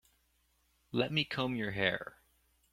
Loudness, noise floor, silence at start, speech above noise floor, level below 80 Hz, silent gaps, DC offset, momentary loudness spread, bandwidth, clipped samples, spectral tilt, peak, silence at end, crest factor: -34 LUFS; -74 dBFS; 0.95 s; 40 dB; -66 dBFS; none; under 0.1%; 8 LU; 16 kHz; under 0.1%; -6 dB/octave; -12 dBFS; 0.6 s; 26 dB